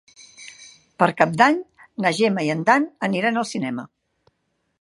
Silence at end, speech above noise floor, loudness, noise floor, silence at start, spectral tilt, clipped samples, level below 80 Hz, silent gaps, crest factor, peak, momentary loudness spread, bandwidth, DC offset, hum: 0.95 s; 52 dB; -20 LUFS; -72 dBFS; 0.4 s; -5 dB/octave; under 0.1%; -70 dBFS; none; 22 dB; 0 dBFS; 22 LU; 11.5 kHz; under 0.1%; none